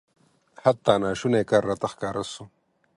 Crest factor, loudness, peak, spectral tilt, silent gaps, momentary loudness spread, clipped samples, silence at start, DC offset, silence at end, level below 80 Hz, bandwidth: 22 dB; -24 LUFS; -4 dBFS; -5.5 dB/octave; none; 11 LU; under 0.1%; 0.65 s; under 0.1%; 0.5 s; -58 dBFS; 11.5 kHz